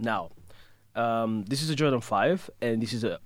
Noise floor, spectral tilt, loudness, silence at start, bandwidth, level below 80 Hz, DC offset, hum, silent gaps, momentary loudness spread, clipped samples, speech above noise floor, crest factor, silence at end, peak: -52 dBFS; -5.5 dB/octave; -28 LUFS; 0 s; 16.5 kHz; -64 dBFS; under 0.1%; none; none; 6 LU; under 0.1%; 24 dB; 18 dB; 0 s; -10 dBFS